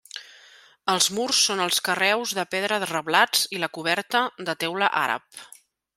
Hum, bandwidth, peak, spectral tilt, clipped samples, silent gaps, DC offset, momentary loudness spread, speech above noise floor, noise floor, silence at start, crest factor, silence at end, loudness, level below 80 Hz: none; 16 kHz; -2 dBFS; -1 dB/octave; under 0.1%; none; under 0.1%; 11 LU; 28 dB; -53 dBFS; 0.15 s; 22 dB; 0.5 s; -23 LUFS; -74 dBFS